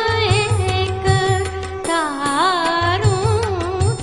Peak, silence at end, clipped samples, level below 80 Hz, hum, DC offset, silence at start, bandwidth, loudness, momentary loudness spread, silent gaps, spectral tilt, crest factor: -4 dBFS; 0 s; under 0.1%; -38 dBFS; none; 0.4%; 0 s; 11 kHz; -18 LUFS; 5 LU; none; -5 dB/octave; 14 dB